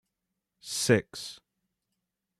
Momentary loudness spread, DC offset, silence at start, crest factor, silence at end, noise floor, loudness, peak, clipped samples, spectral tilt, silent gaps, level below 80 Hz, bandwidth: 18 LU; under 0.1%; 0.65 s; 24 dB; 1.05 s; -85 dBFS; -27 LUFS; -10 dBFS; under 0.1%; -4 dB/octave; none; -70 dBFS; 13.5 kHz